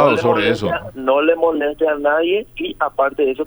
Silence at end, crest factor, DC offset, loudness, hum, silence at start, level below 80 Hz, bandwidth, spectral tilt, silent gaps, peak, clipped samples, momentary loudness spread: 0 s; 16 dB; under 0.1%; -17 LUFS; none; 0 s; -48 dBFS; over 20 kHz; -6 dB/octave; none; -2 dBFS; under 0.1%; 7 LU